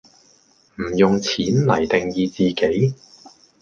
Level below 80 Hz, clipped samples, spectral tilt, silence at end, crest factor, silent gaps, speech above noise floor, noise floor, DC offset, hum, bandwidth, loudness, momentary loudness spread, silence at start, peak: -50 dBFS; under 0.1%; -6 dB/octave; 0.35 s; 20 dB; none; 38 dB; -56 dBFS; under 0.1%; none; 7.4 kHz; -19 LUFS; 8 LU; 0.8 s; -2 dBFS